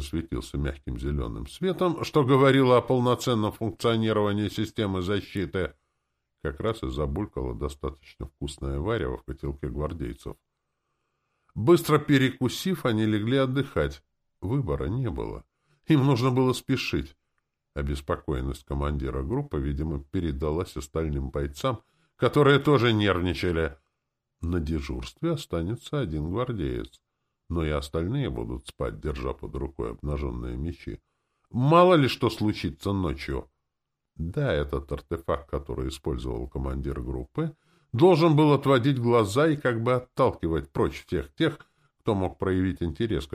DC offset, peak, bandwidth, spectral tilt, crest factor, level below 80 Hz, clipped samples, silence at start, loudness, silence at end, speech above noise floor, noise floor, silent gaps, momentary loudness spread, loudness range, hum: under 0.1%; -6 dBFS; 15.5 kHz; -7 dB/octave; 20 dB; -40 dBFS; under 0.1%; 0 s; -27 LUFS; 0.1 s; 56 dB; -82 dBFS; none; 14 LU; 9 LU; none